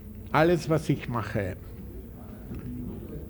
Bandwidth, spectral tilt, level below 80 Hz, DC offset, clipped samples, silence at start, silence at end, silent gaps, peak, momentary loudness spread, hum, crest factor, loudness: over 20 kHz; -7 dB/octave; -46 dBFS; under 0.1%; under 0.1%; 0 s; 0 s; none; -6 dBFS; 19 LU; none; 24 dB; -28 LUFS